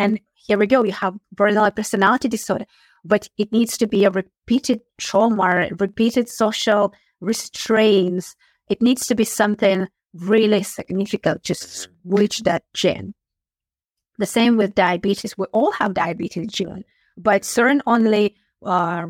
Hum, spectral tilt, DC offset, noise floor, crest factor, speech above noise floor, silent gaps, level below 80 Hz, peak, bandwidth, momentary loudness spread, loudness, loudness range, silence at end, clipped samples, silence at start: none; -4.5 dB/octave; under 0.1%; under -90 dBFS; 18 dB; over 71 dB; none; -58 dBFS; -2 dBFS; 16.5 kHz; 10 LU; -19 LUFS; 2 LU; 0 s; under 0.1%; 0 s